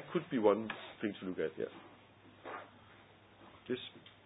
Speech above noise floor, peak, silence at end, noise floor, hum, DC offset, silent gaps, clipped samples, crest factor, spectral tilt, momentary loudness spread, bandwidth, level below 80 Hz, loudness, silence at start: 24 dB; -16 dBFS; 0.15 s; -61 dBFS; none; under 0.1%; none; under 0.1%; 24 dB; -3 dB/octave; 27 LU; 3.9 kHz; -76 dBFS; -38 LUFS; 0 s